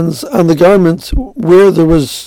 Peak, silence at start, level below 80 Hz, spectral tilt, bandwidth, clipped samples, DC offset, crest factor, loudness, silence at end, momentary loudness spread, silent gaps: 0 dBFS; 0 s; -24 dBFS; -6.5 dB/octave; 17 kHz; 0.8%; under 0.1%; 8 dB; -9 LUFS; 0 s; 10 LU; none